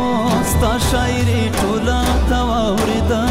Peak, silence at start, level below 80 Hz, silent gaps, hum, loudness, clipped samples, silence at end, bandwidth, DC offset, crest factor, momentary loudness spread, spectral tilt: -6 dBFS; 0 s; -22 dBFS; none; none; -17 LUFS; under 0.1%; 0 s; 16.5 kHz; under 0.1%; 8 dB; 1 LU; -5 dB/octave